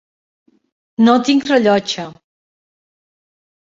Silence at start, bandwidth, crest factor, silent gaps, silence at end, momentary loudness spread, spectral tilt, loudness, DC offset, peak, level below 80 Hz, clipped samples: 1 s; 7.8 kHz; 16 dB; none; 1.5 s; 16 LU; -5 dB/octave; -14 LUFS; under 0.1%; -2 dBFS; -62 dBFS; under 0.1%